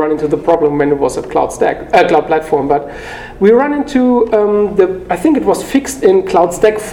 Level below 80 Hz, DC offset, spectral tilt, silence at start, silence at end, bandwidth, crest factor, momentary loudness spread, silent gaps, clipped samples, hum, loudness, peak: -38 dBFS; under 0.1%; -5.5 dB/octave; 0 s; 0 s; 17 kHz; 12 dB; 6 LU; none; 0.2%; none; -12 LUFS; 0 dBFS